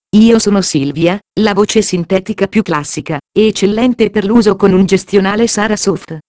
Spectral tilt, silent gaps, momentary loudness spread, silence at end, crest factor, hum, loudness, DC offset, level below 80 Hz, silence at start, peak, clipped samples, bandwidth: -5 dB/octave; none; 7 LU; 0.1 s; 12 dB; none; -12 LUFS; under 0.1%; -42 dBFS; 0.15 s; 0 dBFS; 0.5%; 8 kHz